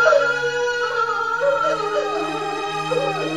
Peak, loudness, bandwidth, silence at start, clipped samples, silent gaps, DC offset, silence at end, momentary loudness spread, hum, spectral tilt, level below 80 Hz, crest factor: -2 dBFS; -21 LUFS; 13 kHz; 0 s; under 0.1%; none; 0.3%; 0 s; 6 LU; none; -3.5 dB/octave; -58 dBFS; 18 dB